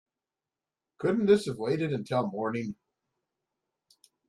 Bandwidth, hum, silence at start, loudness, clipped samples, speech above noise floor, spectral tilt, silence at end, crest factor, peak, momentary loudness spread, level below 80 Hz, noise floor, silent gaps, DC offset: 12 kHz; none; 1 s; -29 LUFS; under 0.1%; over 62 dB; -7 dB/octave; 1.55 s; 20 dB; -10 dBFS; 11 LU; -70 dBFS; under -90 dBFS; none; under 0.1%